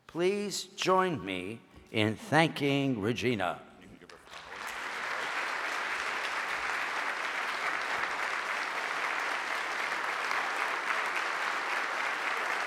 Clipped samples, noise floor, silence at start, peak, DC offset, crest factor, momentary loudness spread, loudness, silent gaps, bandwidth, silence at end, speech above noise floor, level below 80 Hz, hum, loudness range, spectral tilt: under 0.1%; -52 dBFS; 0.1 s; -8 dBFS; under 0.1%; 24 dB; 9 LU; -31 LUFS; none; 16.5 kHz; 0 s; 22 dB; -70 dBFS; none; 4 LU; -4 dB/octave